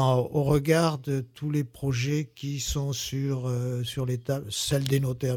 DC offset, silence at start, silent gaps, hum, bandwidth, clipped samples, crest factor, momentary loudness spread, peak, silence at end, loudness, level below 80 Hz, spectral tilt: under 0.1%; 0 s; none; none; 17.5 kHz; under 0.1%; 18 dB; 7 LU; -10 dBFS; 0 s; -28 LUFS; -48 dBFS; -5.5 dB/octave